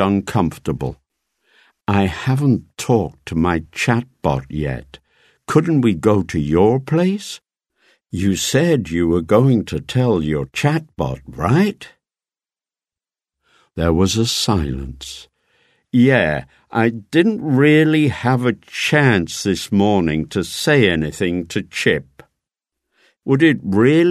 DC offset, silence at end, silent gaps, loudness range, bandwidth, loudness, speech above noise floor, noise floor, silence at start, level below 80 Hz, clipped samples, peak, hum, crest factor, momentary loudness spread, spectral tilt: under 0.1%; 0 s; none; 6 LU; 13.5 kHz; -17 LUFS; over 73 dB; under -90 dBFS; 0 s; -40 dBFS; under 0.1%; 0 dBFS; none; 18 dB; 11 LU; -6 dB/octave